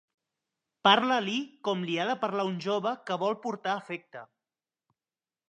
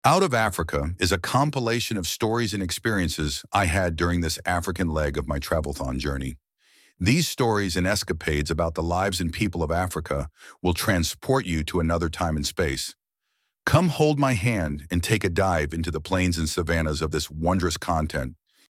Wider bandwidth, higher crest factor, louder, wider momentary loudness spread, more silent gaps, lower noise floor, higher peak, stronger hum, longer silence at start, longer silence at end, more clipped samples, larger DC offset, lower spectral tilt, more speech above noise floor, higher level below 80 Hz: second, 9.8 kHz vs 16.5 kHz; about the same, 24 dB vs 20 dB; second, -29 LUFS vs -25 LUFS; first, 14 LU vs 7 LU; neither; first, under -90 dBFS vs -77 dBFS; about the same, -6 dBFS vs -4 dBFS; neither; first, 0.85 s vs 0.05 s; first, 1.25 s vs 0.35 s; neither; neither; about the same, -4.5 dB/octave vs -5 dB/octave; first, over 61 dB vs 53 dB; second, -84 dBFS vs -38 dBFS